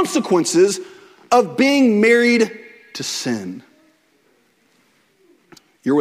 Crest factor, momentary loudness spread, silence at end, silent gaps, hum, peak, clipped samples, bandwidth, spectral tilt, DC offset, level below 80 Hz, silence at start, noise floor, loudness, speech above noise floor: 16 dB; 17 LU; 0 s; none; none; -2 dBFS; under 0.1%; 16 kHz; -4 dB/octave; under 0.1%; -66 dBFS; 0 s; -59 dBFS; -17 LUFS; 43 dB